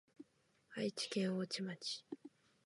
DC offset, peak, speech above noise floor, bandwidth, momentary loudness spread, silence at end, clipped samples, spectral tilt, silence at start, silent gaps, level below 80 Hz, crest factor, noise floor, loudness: under 0.1%; -28 dBFS; 33 dB; 11.5 kHz; 23 LU; 0.35 s; under 0.1%; -4.5 dB/octave; 0.2 s; none; under -90 dBFS; 18 dB; -75 dBFS; -42 LUFS